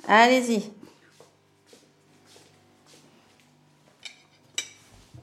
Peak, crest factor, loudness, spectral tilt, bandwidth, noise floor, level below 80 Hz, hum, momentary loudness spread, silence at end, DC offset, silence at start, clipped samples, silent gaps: -4 dBFS; 24 dB; -22 LUFS; -3 dB/octave; 14.5 kHz; -60 dBFS; -72 dBFS; none; 27 LU; 0.6 s; under 0.1%; 0.05 s; under 0.1%; none